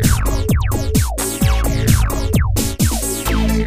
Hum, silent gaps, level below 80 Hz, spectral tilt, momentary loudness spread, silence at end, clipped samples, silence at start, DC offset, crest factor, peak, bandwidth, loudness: none; none; -20 dBFS; -5 dB/octave; 3 LU; 0 s; under 0.1%; 0 s; under 0.1%; 16 dB; 0 dBFS; 15.5 kHz; -17 LUFS